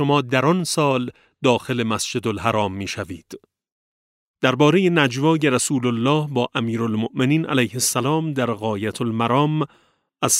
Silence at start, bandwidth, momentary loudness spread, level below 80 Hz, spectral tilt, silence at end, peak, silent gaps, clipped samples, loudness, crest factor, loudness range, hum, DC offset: 0 s; 16 kHz; 8 LU; -60 dBFS; -4.5 dB/octave; 0 s; -2 dBFS; 3.72-4.34 s; under 0.1%; -20 LUFS; 18 dB; 4 LU; none; under 0.1%